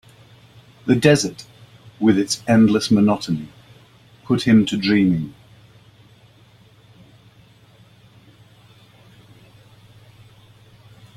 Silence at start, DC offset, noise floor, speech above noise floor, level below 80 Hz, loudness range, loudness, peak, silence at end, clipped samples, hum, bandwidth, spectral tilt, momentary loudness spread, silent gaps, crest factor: 0.85 s; under 0.1%; -51 dBFS; 34 dB; -54 dBFS; 6 LU; -18 LUFS; -2 dBFS; 5.85 s; under 0.1%; none; 13.5 kHz; -5.5 dB/octave; 13 LU; none; 20 dB